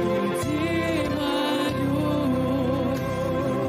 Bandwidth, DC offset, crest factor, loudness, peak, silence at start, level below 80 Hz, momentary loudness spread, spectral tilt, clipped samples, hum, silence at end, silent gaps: 16 kHz; under 0.1%; 10 dB; -25 LUFS; -14 dBFS; 0 s; -46 dBFS; 2 LU; -6 dB/octave; under 0.1%; none; 0 s; none